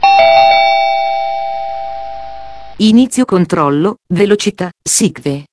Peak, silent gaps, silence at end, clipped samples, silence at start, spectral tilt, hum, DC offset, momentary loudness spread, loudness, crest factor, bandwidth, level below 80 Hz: 0 dBFS; none; 0 s; under 0.1%; 0 s; -4 dB/octave; none; under 0.1%; 18 LU; -11 LUFS; 12 dB; 11 kHz; -48 dBFS